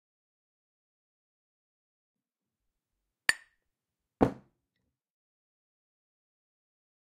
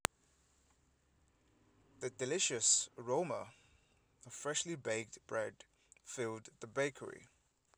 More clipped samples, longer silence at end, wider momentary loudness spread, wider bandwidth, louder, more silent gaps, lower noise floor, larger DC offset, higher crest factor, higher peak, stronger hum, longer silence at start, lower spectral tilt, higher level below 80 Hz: neither; first, 2.75 s vs 0.5 s; second, 13 LU vs 19 LU; second, 9.6 kHz vs over 20 kHz; first, -31 LUFS vs -38 LUFS; neither; first, -89 dBFS vs -74 dBFS; neither; about the same, 36 dB vs 34 dB; about the same, -6 dBFS vs -8 dBFS; neither; first, 3.3 s vs 2 s; first, -4 dB/octave vs -2 dB/octave; first, -62 dBFS vs -76 dBFS